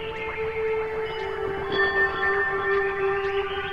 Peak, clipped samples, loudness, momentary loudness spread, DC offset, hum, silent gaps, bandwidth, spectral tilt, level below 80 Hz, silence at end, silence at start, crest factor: -12 dBFS; under 0.1%; -25 LUFS; 7 LU; under 0.1%; none; none; 7 kHz; -6 dB/octave; -48 dBFS; 0 s; 0 s; 14 dB